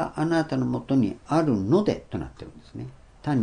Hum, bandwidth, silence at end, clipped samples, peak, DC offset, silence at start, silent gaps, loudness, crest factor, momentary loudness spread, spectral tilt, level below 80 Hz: none; 10 kHz; 0 s; under 0.1%; -10 dBFS; under 0.1%; 0 s; none; -25 LUFS; 16 dB; 18 LU; -8 dB/octave; -52 dBFS